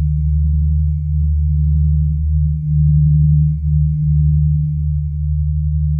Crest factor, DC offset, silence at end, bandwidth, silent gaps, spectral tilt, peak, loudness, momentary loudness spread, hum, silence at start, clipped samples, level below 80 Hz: 10 dB; under 0.1%; 0 s; 0.3 kHz; none; -14.5 dB/octave; -4 dBFS; -16 LUFS; 6 LU; none; 0 s; under 0.1%; -18 dBFS